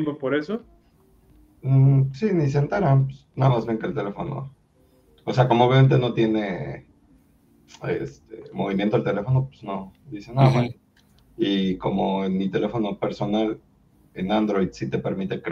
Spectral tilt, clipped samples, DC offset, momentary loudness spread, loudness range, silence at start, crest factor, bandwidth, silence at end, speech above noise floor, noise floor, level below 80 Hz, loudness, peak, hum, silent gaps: -8.5 dB/octave; under 0.1%; under 0.1%; 16 LU; 5 LU; 0 s; 20 dB; 6.8 kHz; 0 s; 37 dB; -59 dBFS; -54 dBFS; -23 LUFS; -4 dBFS; none; none